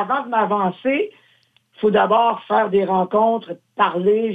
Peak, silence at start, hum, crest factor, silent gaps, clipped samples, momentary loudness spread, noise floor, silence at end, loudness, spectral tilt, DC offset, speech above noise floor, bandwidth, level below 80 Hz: -4 dBFS; 0 s; none; 14 dB; none; under 0.1%; 7 LU; -59 dBFS; 0 s; -19 LUFS; -8.5 dB/octave; under 0.1%; 41 dB; 4.7 kHz; -66 dBFS